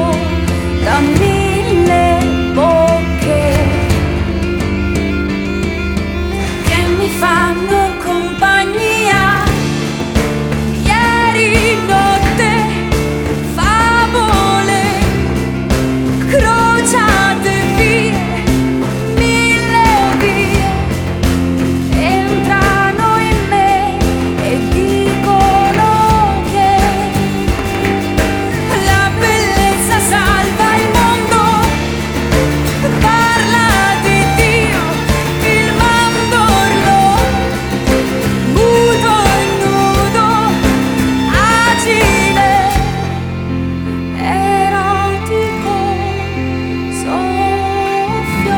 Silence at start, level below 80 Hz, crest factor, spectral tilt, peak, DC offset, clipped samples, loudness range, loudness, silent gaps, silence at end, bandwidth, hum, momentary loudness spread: 0 s; -24 dBFS; 12 dB; -5 dB/octave; 0 dBFS; under 0.1%; under 0.1%; 4 LU; -12 LUFS; none; 0 s; over 20 kHz; none; 6 LU